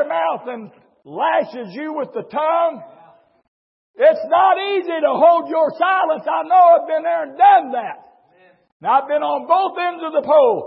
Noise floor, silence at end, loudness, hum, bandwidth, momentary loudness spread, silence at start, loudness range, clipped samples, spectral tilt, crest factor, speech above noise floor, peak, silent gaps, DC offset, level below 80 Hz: -54 dBFS; 0 s; -17 LUFS; none; 5.8 kHz; 15 LU; 0 s; 8 LU; under 0.1%; -9 dB/octave; 14 dB; 37 dB; -2 dBFS; 3.48-3.94 s, 8.72-8.80 s; under 0.1%; -78 dBFS